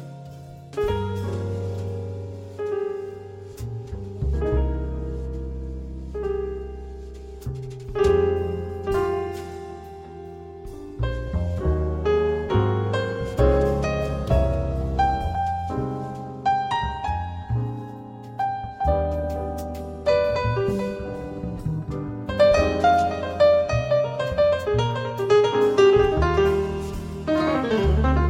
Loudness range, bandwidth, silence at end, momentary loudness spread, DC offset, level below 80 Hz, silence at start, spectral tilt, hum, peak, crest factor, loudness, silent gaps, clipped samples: 9 LU; 15.5 kHz; 0 s; 17 LU; under 0.1%; -32 dBFS; 0 s; -7 dB/octave; none; -6 dBFS; 18 dB; -24 LUFS; none; under 0.1%